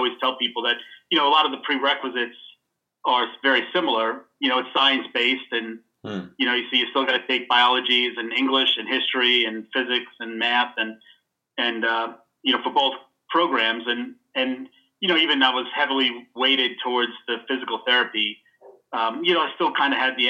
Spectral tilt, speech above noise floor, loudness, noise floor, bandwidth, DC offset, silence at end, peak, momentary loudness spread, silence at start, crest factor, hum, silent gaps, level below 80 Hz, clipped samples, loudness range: -4 dB/octave; 53 dB; -21 LUFS; -75 dBFS; 8 kHz; under 0.1%; 0 s; -4 dBFS; 10 LU; 0 s; 20 dB; none; none; -84 dBFS; under 0.1%; 4 LU